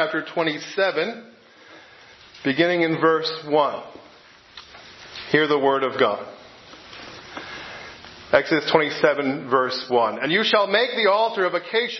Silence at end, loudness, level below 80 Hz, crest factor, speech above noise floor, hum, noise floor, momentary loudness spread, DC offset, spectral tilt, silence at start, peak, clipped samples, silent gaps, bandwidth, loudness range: 0 s; -21 LUFS; -64 dBFS; 22 dB; 29 dB; none; -49 dBFS; 21 LU; under 0.1%; -5 dB/octave; 0 s; 0 dBFS; under 0.1%; none; 6.2 kHz; 5 LU